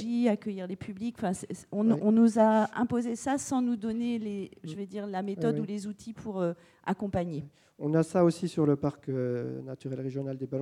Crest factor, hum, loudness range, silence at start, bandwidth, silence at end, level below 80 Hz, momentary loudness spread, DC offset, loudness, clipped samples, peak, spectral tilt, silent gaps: 18 dB; none; 7 LU; 0 s; 11.5 kHz; 0 s; -66 dBFS; 14 LU; under 0.1%; -30 LUFS; under 0.1%; -12 dBFS; -7 dB/octave; none